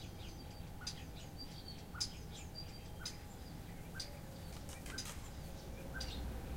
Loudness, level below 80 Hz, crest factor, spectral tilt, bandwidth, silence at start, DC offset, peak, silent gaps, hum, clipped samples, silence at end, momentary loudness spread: -48 LUFS; -52 dBFS; 22 dB; -3.5 dB/octave; 16.5 kHz; 0 s; under 0.1%; -26 dBFS; none; none; under 0.1%; 0 s; 8 LU